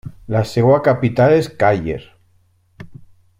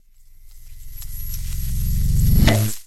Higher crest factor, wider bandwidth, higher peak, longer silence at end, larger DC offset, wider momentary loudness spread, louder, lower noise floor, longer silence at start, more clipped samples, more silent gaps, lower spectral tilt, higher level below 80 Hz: about the same, 16 dB vs 18 dB; about the same, 15.5 kHz vs 16 kHz; about the same, -2 dBFS vs -2 dBFS; first, 0.45 s vs 0 s; neither; second, 9 LU vs 19 LU; first, -16 LUFS vs -21 LUFS; first, -57 dBFS vs -44 dBFS; second, 0.05 s vs 0.45 s; neither; neither; first, -7.5 dB/octave vs -5.5 dB/octave; second, -46 dBFS vs -22 dBFS